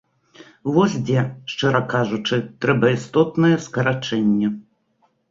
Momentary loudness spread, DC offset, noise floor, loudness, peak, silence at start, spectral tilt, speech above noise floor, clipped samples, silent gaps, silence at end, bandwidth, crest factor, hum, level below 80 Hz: 6 LU; under 0.1%; -64 dBFS; -20 LUFS; -2 dBFS; 0.65 s; -6.5 dB/octave; 45 dB; under 0.1%; none; 0.7 s; 7.8 kHz; 18 dB; none; -58 dBFS